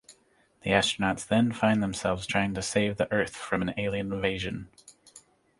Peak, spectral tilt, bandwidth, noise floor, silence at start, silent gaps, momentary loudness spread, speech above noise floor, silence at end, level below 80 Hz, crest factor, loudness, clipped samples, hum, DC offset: -6 dBFS; -4.5 dB/octave; 11.5 kHz; -65 dBFS; 0.1 s; none; 8 LU; 37 dB; 0.4 s; -52 dBFS; 24 dB; -28 LUFS; under 0.1%; none; under 0.1%